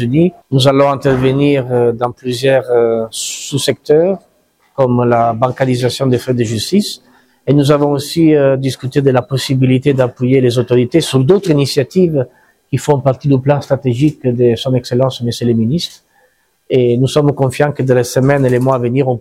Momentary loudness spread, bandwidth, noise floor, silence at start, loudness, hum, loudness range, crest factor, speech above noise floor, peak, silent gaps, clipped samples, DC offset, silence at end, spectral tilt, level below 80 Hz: 5 LU; 15.5 kHz; -56 dBFS; 0 s; -13 LUFS; none; 2 LU; 12 dB; 44 dB; 0 dBFS; none; under 0.1%; under 0.1%; 0 s; -6.5 dB/octave; -46 dBFS